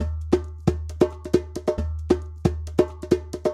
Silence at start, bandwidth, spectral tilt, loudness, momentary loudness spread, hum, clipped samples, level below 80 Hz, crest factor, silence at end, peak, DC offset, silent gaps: 0 s; 13 kHz; -7.5 dB/octave; -25 LUFS; 4 LU; none; under 0.1%; -34 dBFS; 22 dB; 0 s; -2 dBFS; under 0.1%; none